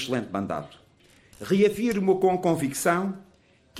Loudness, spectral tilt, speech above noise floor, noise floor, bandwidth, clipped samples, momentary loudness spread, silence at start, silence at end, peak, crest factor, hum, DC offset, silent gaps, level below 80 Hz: -25 LUFS; -5.5 dB/octave; 32 dB; -57 dBFS; 15.5 kHz; under 0.1%; 14 LU; 0 s; 0 s; -10 dBFS; 16 dB; none; under 0.1%; none; -60 dBFS